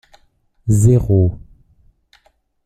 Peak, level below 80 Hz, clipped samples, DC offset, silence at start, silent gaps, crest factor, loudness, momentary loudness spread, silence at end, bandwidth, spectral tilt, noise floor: -2 dBFS; -36 dBFS; under 0.1%; under 0.1%; 0.65 s; none; 16 dB; -15 LUFS; 16 LU; 1.25 s; 13.5 kHz; -9 dB/octave; -58 dBFS